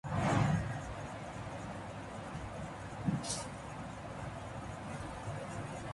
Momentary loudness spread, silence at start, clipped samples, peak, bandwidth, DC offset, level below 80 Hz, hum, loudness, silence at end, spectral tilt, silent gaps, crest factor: 12 LU; 0.05 s; under 0.1%; -20 dBFS; 11.5 kHz; under 0.1%; -54 dBFS; none; -40 LUFS; 0 s; -5.5 dB/octave; none; 20 dB